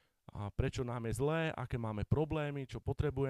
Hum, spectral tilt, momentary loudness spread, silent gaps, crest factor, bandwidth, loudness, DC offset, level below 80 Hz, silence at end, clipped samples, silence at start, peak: none; -7 dB/octave; 8 LU; none; 20 dB; 13.5 kHz; -38 LUFS; under 0.1%; -48 dBFS; 0 s; under 0.1%; 0.35 s; -16 dBFS